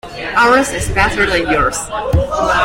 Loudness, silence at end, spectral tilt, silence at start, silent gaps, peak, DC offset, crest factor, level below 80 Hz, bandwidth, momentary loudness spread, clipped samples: -14 LUFS; 0 s; -4 dB/octave; 0.05 s; none; -2 dBFS; under 0.1%; 12 dB; -28 dBFS; 16.5 kHz; 6 LU; under 0.1%